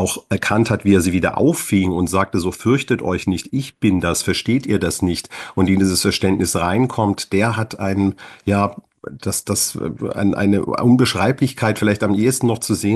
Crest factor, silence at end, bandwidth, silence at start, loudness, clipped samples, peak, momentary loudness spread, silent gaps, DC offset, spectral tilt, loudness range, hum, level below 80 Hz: 16 dB; 0 s; 13 kHz; 0 s; -18 LUFS; under 0.1%; -2 dBFS; 7 LU; none; under 0.1%; -5 dB/octave; 3 LU; none; -44 dBFS